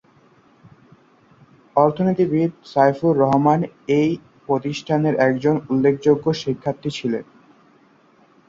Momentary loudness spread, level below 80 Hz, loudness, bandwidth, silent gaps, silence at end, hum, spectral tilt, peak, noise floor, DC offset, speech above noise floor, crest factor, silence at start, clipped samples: 8 LU; -58 dBFS; -20 LUFS; 7.6 kHz; none; 1.25 s; none; -7.5 dB/octave; -2 dBFS; -55 dBFS; under 0.1%; 36 dB; 18 dB; 1.75 s; under 0.1%